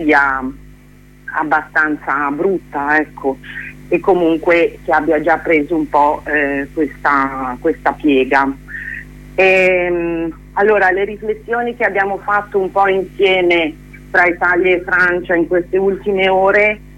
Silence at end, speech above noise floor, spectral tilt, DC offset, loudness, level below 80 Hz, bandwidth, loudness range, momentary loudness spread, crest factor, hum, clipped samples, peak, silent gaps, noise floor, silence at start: 0 s; 28 dB; -6 dB/octave; under 0.1%; -15 LUFS; -40 dBFS; 12 kHz; 3 LU; 10 LU; 14 dB; 50 Hz at -40 dBFS; under 0.1%; 0 dBFS; none; -42 dBFS; 0 s